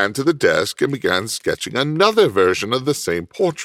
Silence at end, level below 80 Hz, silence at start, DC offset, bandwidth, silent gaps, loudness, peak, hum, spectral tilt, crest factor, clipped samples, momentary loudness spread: 0 s; -54 dBFS; 0 s; under 0.1%; 16 kHz; none; -18 LUFS; -2 dBFS; none; -4 dB/octave; 16 dB; under 0.1%; 7 LU